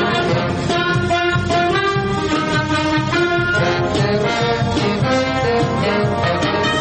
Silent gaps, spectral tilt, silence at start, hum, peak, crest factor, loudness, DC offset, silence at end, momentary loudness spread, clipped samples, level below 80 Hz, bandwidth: none; -5.5 dB/octave; 0 s; none; -6 dBFS; 10 dB; -17 LUFS; under 0.1%; 0 s; 2 LU; under 0.1%; -40 dBFS; 8.8 kHz